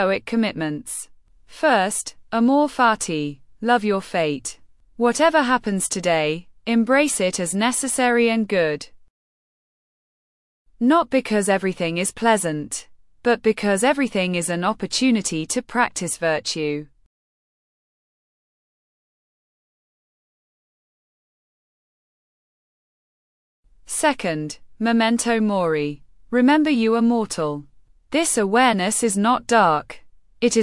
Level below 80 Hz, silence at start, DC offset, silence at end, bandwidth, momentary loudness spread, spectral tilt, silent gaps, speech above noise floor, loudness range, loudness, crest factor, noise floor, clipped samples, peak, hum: -56 dBFS; 0 s; under 0.1%; 0 s; 12 kHz; 11 LU; -4 dB/octave; 9.10-10.65 s, 17.06-23.63 s; over 70 dB; 6 LU; -20 LUFS; 18 dB; under -90 dBFS; under 0.1%; -4 dBFS; none